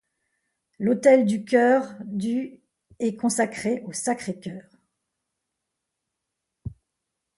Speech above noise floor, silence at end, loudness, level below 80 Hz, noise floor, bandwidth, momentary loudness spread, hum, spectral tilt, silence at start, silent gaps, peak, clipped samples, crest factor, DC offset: 60 dB; 0.7 s; -23 LUFS; -60 dBFS; -82 dBFS; 11.5 kHz; 23 LU; none; -5 dB/octave; 0.8 s; none; -6 dBFS; under 0.1%; 20 dB; under 0.1%